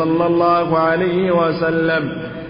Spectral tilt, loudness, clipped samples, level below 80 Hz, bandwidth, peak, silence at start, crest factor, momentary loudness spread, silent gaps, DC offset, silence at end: -12 dB/octave; -16 LUFS; under 0.1%; -48 dBFS; 5.4 kHz; -4 dBFS; 0 s; 12 dB; 4 LU; none; under 0.1%; 0 s